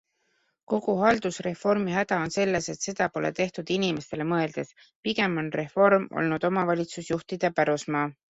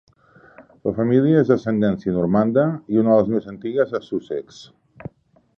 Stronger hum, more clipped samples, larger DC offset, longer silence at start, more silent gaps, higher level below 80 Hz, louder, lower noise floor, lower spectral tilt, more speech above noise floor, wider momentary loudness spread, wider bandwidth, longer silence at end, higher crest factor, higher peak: neither; neither; neither; about the same, 0.7 s vs 0.6 s; first, 4.95-5.03 s vs none; second, -62 dBFS vs -54 dBFS; second, -26 LUFS vs -20 LUFS; first, -72 dBFS vs -52 dBFS; second, -5 dB/octave vs -9 dB/octave; first, 46 dB vs 33 dB; second, 8 LU vs 14 LU; first, 8.2 kHz vs 7.2 kHz; second, 0.2 s vs 0.95 s; about the same, 20 dB vs 18 dB; second, -6 dBFS vs -2 dBFS